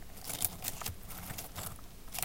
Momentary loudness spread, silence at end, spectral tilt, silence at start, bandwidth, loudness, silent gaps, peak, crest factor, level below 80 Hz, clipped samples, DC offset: 10 LU; 0 s; -2 dB/octave; 0 s; 17 kHz; -39 LUFS; none; -10 dBFS; 32 dB; -52 dBFS; under 0.1%; under 0.1%